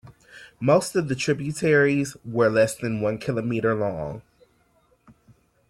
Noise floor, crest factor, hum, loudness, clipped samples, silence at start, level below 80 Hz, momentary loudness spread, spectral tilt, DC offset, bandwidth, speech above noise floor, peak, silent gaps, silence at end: -63 dBFS; 18 dB; none; -23 LUFS; under 0.1%; 0.05 s; -58 dBFS; 9 LU; -6 dB/octave; under 0.1%; 14.5 kHz; 41 dB; -6 dBFS; none; 1.5 s